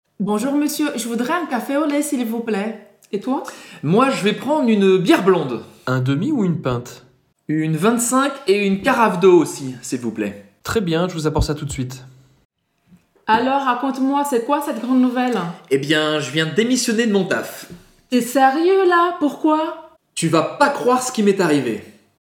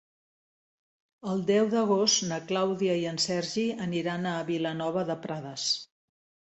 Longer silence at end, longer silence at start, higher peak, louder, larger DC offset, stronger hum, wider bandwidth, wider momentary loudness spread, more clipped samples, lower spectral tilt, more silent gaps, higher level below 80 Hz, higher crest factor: second, 0.35 s vs 0.7 s; second, 0.2 s vs 1.25 s; first, -2 dBFS vs -12 dBFS; first, -18 LUFS vs -28 LUFS; neither; neither; first, 17.5 kHz vs 8.2 kHz; first, 12 LU vs 8 LU; neither; about the same, -5 dB/octave vs -4 dB/octave; first, 12.45-12.50 s vs none; first, -44 dBFS vs -72 dBFS; about the same, 18 dB vs 18 dB